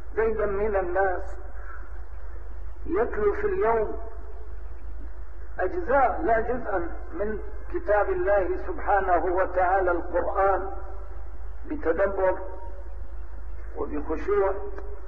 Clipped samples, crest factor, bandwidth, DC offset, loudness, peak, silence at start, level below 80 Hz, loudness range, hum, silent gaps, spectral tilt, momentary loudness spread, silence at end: under 0.1%; 16 dB; 5 kHz; 3%; -26 LUFS; -10 dBFS; 0 s; -38 dBFS; 4 LU; none; none; -9.5 dB/octave; 19 LU; 0 s